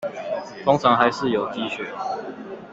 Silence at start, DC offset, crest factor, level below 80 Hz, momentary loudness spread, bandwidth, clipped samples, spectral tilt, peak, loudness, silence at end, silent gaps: 0 s; under 0.1%; 22 dB; -60 dBFS; 13 LU; 8 kHz; under 0.1%; -5.5 dB/octave; -2 dBFS; -22 LUFS; 0 s; none